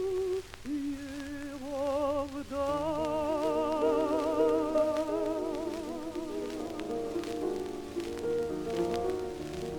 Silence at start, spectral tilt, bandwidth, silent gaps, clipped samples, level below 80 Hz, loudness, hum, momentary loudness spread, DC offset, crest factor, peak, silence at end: 0 s; -5.5 dB/octave; 19 kHz; none; under 0.1%; -54 dBFS; -33 LUFS; none; 10 LU; under 0.1%; 16 dB; -16 dBFS; 0 s